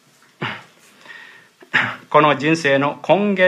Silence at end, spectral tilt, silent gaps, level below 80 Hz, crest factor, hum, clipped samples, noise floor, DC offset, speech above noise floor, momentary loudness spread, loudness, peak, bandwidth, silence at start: 0 s; -5.5 dB/octave; none; -70 dBFS; 18 dB; none; under 0.1%; -46 dBFS; under 0.1%; 31 dB; 22 LU; -18 LUFS; 0 dBFS; 12 kHz; 0.4 s